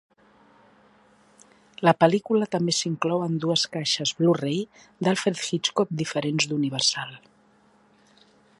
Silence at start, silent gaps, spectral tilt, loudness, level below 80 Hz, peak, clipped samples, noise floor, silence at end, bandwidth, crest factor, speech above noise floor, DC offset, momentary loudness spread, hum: 1.8 s; none; -4 dB/octave; -24 LUFS; -70 dBFS; -2 dBFS; under 0.1%; -60 dBFS; 1.4 s; 11.5 kHz; 24 dB; 36 dB; under 0.1%; 7 LU; none